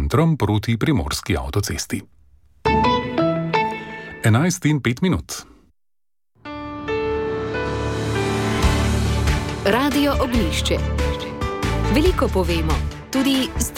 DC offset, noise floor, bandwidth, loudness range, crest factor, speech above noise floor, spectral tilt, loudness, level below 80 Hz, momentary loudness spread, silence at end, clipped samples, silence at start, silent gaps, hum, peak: under 0.1%; -82 dBFS; 17 kHz; 4 LU; 16 dB; 63 dB; -5.5 dB/octave; -21 LUFS; -28 dBFS; 8 LU; 0 s; under 0.1%; 0 s; none; none; -4 dBFS